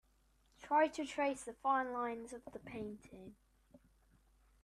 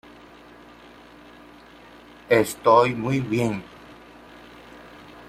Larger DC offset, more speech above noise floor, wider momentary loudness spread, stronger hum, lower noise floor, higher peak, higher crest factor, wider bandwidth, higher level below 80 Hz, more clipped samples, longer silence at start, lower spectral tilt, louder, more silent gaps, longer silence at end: neither; first, 34 dB vs 27 dB; second, 23 LU vs 28 LU; neither; first, -73 dBFS vs -47 dBFS; second, -20 dBFS vs -4 dBFS; about the same, 20 dB vs 22 dB; second, 13.5 kHz vs 16 kHz; second, -72 dBFS vs -58 dBFS; neither; second, 0.6 s vs 2.3 s; second, -4 dB/octave vs -6 dB/octave; second, -38 LUFS vs -21 LUFS; neither; first, 0.85 s vs 0.2 s